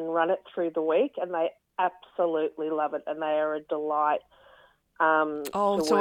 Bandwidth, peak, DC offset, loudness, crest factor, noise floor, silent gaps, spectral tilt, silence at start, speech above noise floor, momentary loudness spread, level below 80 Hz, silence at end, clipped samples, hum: 17 kHz; -10 dBFS; under 0.1%; -28 LUFS; 18 dB; -59 dBFS; none; -4.5 dB/octave; 0 s; 32 dB; 7 LU; -72 dBFS; 0 s; under 0.1%; none